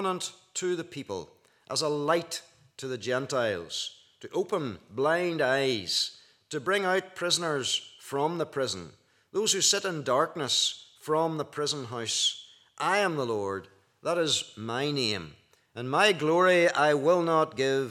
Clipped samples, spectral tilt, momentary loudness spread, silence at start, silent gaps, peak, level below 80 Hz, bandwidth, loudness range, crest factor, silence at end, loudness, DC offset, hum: under 0.1%; -3 dB/octave; 14 LU; 0 s; none; -8 dBFS; -78 dBFS; 16 kHz; 6 LU; 20 dB; 0 s; -28 LUFS; under 0.1%; none